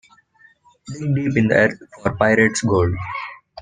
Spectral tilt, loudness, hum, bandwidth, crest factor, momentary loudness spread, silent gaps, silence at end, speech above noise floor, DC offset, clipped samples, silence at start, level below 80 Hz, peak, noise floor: -6 dB/octave; -19 LUFS; none; 10 kHz; 18 dB; 14 LU; none; 0 s; 36 dB; under 0.1%; under 0.1%; 0.85 s; -50 dBFS; -2 dBFS; -54 dBFS